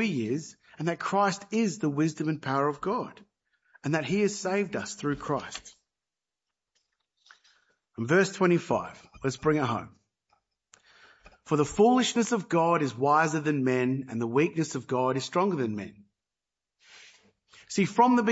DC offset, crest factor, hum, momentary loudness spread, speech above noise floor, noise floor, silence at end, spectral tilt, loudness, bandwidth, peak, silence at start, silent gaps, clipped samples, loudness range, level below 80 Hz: under 0.1%; 20 dB; none; 11 LU; over 63 dB; under -90 dBFS; 0 s; -5.5 dB/octave; -27 LUFS; 8 kHz; -8 dBFS; 0 s; none; under 0.1%; 7 LU; -64 dBFS